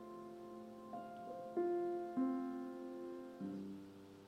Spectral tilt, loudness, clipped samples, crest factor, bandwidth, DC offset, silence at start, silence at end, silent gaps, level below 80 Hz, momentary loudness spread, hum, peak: -8 dB/octave; -45 LUFS; under 0.1%; 16 dB; 14 kHz; under 0.1%; 0 s; 0 s; none; -84 dBFS; 13 LU; none; -30 dBFS